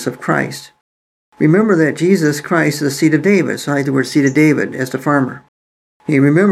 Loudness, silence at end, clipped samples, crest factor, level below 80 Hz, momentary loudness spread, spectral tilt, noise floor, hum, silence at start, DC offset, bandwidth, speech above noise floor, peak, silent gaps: -14 LUFS; 0 s; under 0.1%; 14 dB; -64 dBFS; 8 LU; -6 dB/octave; under -90 dBFS; none; 0 s; under 0.1%; 14.5 kHz; over 77 dB; 0 dBFS; 0.81-1.32 s, 5.48-6.00 s